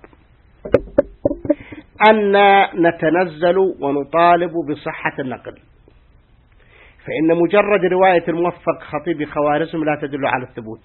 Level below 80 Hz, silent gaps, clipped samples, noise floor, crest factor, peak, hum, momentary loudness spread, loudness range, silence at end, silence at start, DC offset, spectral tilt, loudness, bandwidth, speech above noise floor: -46 dBFS; none; under 0.1%; -51 dBFS; 18 dB; 0 dBFS; none; 12 LU; 6 LU; 0.1 s; 0.65 s; under 0.1%; -9 dB/octave; -17 LUFS; 4.3 kHz; 35 dB